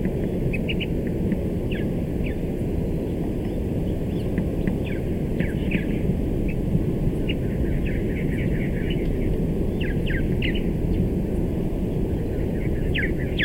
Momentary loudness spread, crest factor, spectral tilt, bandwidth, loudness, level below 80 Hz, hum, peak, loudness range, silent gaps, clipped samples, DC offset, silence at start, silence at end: 2 LU; 16 dB; -8 dB/octave; 16 kHz; -25 LUFS; -28 dBFS; none; -8 dBFS; 1 LU; none; under 0.1%; under 0.1%; 0 s; 0 s